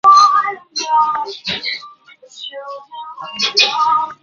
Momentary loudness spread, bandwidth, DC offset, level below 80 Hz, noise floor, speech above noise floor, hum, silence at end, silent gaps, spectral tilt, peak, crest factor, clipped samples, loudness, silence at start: 19 LU; 7.4 kHz; under 0.1%; -62 dBFS; -42 dBFS; 24 dB; none; 0.1 s; none; 0 dB/octave; 0 dBFS; 16 dB; under 0.1%; -14 LUFS; 0.05 s